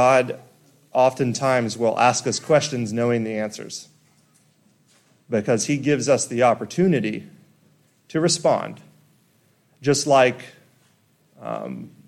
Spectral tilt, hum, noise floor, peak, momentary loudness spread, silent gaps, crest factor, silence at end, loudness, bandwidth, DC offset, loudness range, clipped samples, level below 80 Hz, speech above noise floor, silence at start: -4.5 dB/octave; none; -61 dBFS; -4 dBFS; 16 LU; none; 18 dB; 0.2 s; -21 LUFS; 14.5 kHz; under 0.1%; 4 LU; under 0.1%; -66 dBFS; 41 dB; 0 s